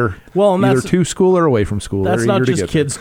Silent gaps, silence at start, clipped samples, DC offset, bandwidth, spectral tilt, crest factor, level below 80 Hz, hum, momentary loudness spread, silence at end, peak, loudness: none; 0 s; under 0.1%; under 0.1%; 16.5 kHz; -6 dB/octave; 14 dB; -40 dBFS; none; 6 LU; 0 s; -2 dBFS; -15 LUFS